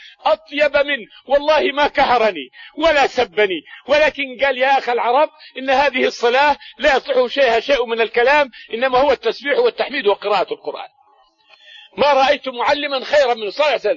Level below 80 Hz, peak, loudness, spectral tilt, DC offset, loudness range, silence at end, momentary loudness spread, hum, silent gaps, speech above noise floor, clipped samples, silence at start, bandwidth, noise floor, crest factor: -50 dBFS; -4 dBFS; -16 LUFS; -3 dB/octave; under 0.1%; 3 LU; 0 s; 6 LU; none; none; 38 dB; under 0.1%; 0 s; 7.4 kHz; -55 dBFS; 14 dB